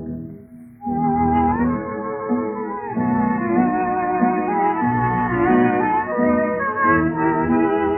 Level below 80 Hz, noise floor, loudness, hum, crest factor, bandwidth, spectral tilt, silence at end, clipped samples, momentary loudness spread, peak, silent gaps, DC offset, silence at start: -44 dBFS; -40 dBFS; -19 LUFS; none; 14 dB; 3.2 kHz; -11.5 dB/octave; 0 s; under 0.1%; 9 LU; -4 dBFS; none; under 0.1%; 0 s